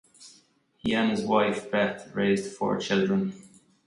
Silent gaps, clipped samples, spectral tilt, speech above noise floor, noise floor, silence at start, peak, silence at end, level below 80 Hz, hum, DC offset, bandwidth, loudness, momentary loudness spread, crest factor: none; under 0.1%; -5.5 dB/octave; 36 dB; -62 dBFS; 0.2 s; -8 dBFS; 0.4 s; -62 dBFS; none; under 0.1%; 11.5 kHz; -27 LUFS; 5 LU; 20 dB